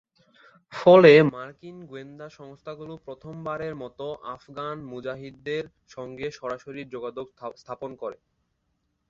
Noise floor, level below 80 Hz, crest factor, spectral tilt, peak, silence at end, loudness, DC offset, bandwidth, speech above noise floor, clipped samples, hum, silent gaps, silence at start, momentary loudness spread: -75 dBFS; -64 dBFS; 24 dB; -7 dB/octave; -2 dBFS; 0.95 s; -22 LUFS; under 0.1%; 7.4 kHz; 50 dB; under 0.1%; none; none; 0.7 s; 25 LU